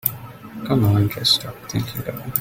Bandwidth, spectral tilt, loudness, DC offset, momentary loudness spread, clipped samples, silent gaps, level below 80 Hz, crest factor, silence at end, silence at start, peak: 17 kHz; -5 dB/octave; -20 LUFS; under 0.1%; 16 LU; under 0.1%; none; -48 dBFS; 22 dB; 0 s; 0.05 s; 0 dBFS